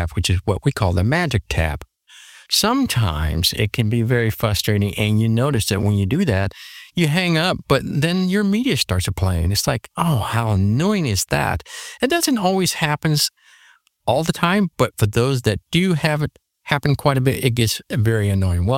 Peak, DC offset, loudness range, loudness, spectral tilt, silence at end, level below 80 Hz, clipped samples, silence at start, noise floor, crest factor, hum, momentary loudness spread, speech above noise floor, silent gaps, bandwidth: -2 dBFS; under 0.1%; 1 LU; -19 LUFS; -5 dB/octave; 0 s; -36 dBFS; under 0.1%; 0 s; -54 dBFS; 18 dB; none; 4 LU; 35 dB; none; 17 kHz